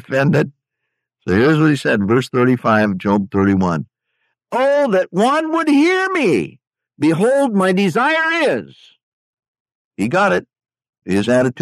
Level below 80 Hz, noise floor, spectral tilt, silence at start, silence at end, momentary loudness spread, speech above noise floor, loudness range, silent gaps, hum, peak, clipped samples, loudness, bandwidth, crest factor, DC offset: -56 dBFS; -77 dBFS; -6.5 dB/octave; 0.1 s; 0 s; 7 LU; 62 dB; 3 LU; 9.03-9.37 s, 9.48-9.54 s, 9.60-9.65 s, 9.75-9.91 s, 10.89-10.93 s; none; -4 dBFS; under 0.1%; -16 LUFS; 13.5 kHz; 14 dB; under 0.1%